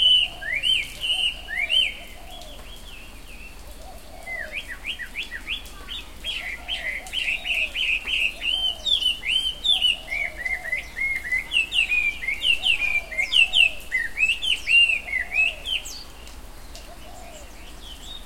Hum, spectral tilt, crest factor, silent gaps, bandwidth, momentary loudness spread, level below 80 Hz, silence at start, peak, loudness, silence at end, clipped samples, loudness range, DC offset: none; 0 dB/octave; 20 dB; none; 16.5 kHz; 24 LU; -44 dBFS; 0 s; -6 dBFS; -21 LUFS; 0 s; under 0.1%; 13 LU; 0.6%